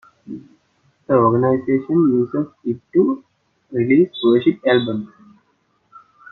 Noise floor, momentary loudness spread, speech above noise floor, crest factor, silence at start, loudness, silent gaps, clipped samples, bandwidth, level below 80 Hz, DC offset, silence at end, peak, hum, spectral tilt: -64 dBFS; 18 LU; 47 dB; 16 dB; 0.3 s; -18 LUFS; none; under 0.1%; 4.2 kHz; -62 dBFS; under 0.1%; 0.35 s; -2 dBFS; none; -9.5 dB/octave